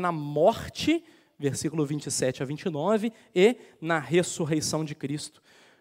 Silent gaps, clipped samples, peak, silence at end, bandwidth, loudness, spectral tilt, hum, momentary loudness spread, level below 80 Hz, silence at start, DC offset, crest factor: none; under 0.1%; -8 dBFS; 0.5 s; 16 kHz; -27 LUFS; -5 dB/octave; none; 10 LU; -62 dBFS; 0 s; under 0.1%; 20 dB